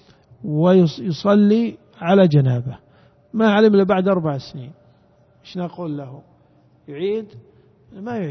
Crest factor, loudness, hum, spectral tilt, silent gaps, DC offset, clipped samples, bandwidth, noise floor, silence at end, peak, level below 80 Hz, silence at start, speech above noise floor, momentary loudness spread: 18 dB; -18 LUFS; none; -8.5 dB/octave; none; under 0.1%; under 0.1%; 6.2 kHz; -55 dBFS; 0 s; -2 dBFS; -60 dBFS; 0.4 s; 37 dB; 20 LU